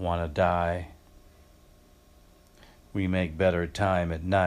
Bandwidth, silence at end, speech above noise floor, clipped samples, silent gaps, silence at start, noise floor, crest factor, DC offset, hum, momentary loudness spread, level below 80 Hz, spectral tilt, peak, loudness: 12.5 kHz; 0 s; 30 dB; under 0.1%; none; 0 s; -57 dBFS; 18 dB; under 0.1%; none; 10 LU; -46 dBFS; -7 dB/octave; -10 dBFS; -28 LUFS